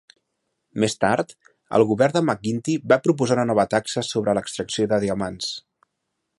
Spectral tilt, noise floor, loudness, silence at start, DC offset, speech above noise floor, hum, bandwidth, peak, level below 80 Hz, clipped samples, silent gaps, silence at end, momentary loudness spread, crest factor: -5 dB/octave; -78 dBFS; -22 LUFS; 0.75 s; under 0.1%; 56 dB; none; 11.5 kHz; -2 dBFS; -58 dBFS; under 0.1%; none; 0.8 s; 9 LU; 20 dB